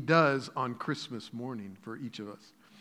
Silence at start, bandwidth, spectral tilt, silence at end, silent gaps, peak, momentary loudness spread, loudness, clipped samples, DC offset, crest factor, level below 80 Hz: 0 s; 12 kHz; -6 dB/octave; 0 s; none; -10 dBFS; 18 LU; -33 LUFS; under 0.1%; under 0.1%; 22 dB; -86 dBFS